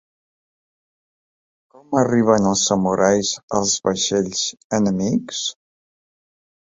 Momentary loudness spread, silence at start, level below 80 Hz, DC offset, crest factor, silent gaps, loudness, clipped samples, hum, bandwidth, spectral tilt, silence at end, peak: 7 LU; 1.9 s; -54 dBFS; under 0.1%; 20 dB; 3.43-3.48 s, 4.64-4.70 s; -19 LUFS; under 0.1%; none; 7.8 kHz; -4 dB/octave; 1.15 s; -2 dBFS